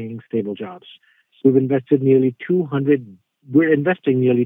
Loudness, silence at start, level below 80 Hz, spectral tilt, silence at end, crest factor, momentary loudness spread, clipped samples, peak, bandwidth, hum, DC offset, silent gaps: -18 LUFS; 0 s; -68 dBFS; -11.5 dB/octave; 0 s; 16 dB; 10 LU; under 0.1%; -2 dBFS; 3.8 kHz; none; under 0.1%; none